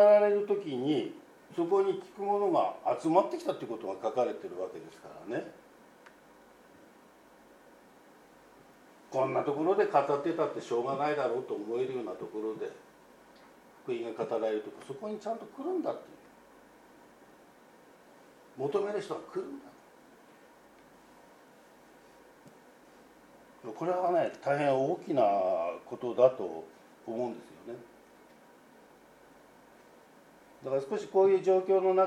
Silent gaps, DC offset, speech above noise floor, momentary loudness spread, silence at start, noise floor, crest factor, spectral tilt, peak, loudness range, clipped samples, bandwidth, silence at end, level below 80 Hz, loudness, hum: none; under 0.1%; 28 dB; 18 LU; 0 s; -58 dBFS; 22 dB; -6.5 dB/octave; -12 dBFS; 14 LU; under 0.1%; 12 kHz; 0 s; -80 dBFS; -31 LUFS; none